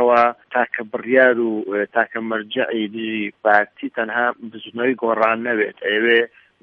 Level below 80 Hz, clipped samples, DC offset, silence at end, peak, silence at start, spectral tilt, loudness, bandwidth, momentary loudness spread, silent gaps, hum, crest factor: -72 dBFS; under 0.1%; under 0.1%; 0.35 s; 0 dBFS; 0 s; -6.5 dB/octave; -19 LUFS; 6 kHz; 10 LU; none; none; 18 dB